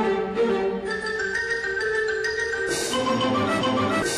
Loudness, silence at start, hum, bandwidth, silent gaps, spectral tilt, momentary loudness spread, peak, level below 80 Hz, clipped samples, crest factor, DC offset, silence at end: -24 LUFS; 0 s; none; 14 kHz; none; -3.5 dB/octave; 3 LU; -12 dBFS; -52 dBFS; under 0.1%; 12 dB; under 0.1%; 0 s